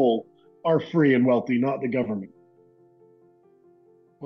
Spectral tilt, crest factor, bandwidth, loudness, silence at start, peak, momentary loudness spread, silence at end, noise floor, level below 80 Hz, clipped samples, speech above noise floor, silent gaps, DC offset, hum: -9 dB/octave; 16 dB; 6 kHz; -24 LUFS; 0 s; -10 dBFS; 11 LU; 0 s; -58 dBFS; -74 dBFS; under 0.1%; 36 dB; none; under 0.1%; none